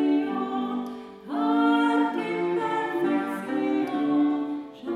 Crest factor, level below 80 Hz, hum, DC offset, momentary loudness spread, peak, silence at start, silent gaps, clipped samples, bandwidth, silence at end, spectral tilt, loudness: 14 dB; -72 dBFS; none; under 0.1%; 11 LU; -10 dBFS; 0 s; none; under 0.1%; 10 kHz; 0 s; -6 dB/octave; -26 LUFS